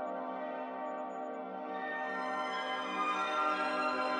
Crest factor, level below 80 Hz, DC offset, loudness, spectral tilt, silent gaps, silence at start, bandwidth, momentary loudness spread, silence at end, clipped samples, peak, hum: 16 dB; under -90 dBFS; under 0.1%; -36 LUFS; -3.5 dB/octave; none; 0 s; 11 kHz; 9 LU; 0 s; under 0.1%; -20 dBFS; none